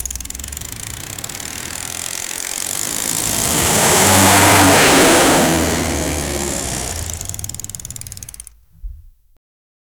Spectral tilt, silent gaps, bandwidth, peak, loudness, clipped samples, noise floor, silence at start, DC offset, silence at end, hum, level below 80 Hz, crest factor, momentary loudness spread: -2.5 dB/octave; none; over 20 kHz; -2 dBFS; -14 LUFS; under 0.1%; -39 dBFS; 0 s; under 0.1%; 0.9 s; none; -34 dBFS; 16 dB; 18 LU